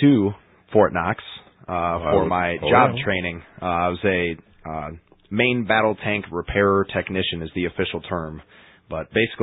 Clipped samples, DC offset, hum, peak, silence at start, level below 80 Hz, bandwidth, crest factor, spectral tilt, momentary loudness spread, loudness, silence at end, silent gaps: under 0.1%; under 0.1%; none; -2 dBFS; 0 s; -44 dBFS; 4 kHz; 20 dB; -11 dB/octave; 15 LU; -22 LUFS; 0 s; none